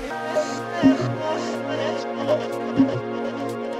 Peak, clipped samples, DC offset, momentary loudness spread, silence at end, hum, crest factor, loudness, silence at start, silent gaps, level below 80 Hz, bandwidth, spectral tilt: -6 dBFS; under 0.1%; under 0.1%; 8 LU; 0 s; none; 18 dB; -24 LUFS; 0 s; none; -56 dBFS; 12 kHz; -6 dB/octave